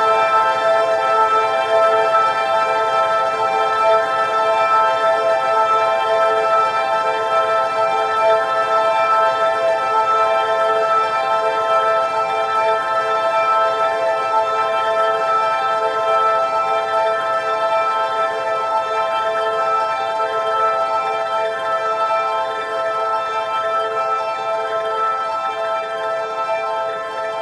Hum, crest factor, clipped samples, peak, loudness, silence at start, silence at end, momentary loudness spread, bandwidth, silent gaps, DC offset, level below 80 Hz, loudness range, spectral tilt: none; 14 dB; under 0.1%; -4 dBFS; -17 LUFS; 0 s; 0 s; 6 LU; 12 kHz; none; under 0.1%; -62 dBFS; 4 LU; -2.5 dB/octave